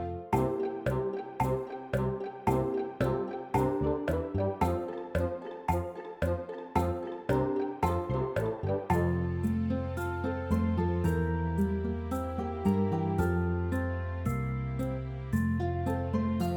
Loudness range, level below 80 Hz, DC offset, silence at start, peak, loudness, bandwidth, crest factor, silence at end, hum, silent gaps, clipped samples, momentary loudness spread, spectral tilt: 2 LU; -44 dBFS; under 0.1%; 0 s; -14 dBFS; -32 LUFS; 19 kHz; 18 dB; 0 s; none; none; under 0.1%; 5 LU; -8.5 dB/octave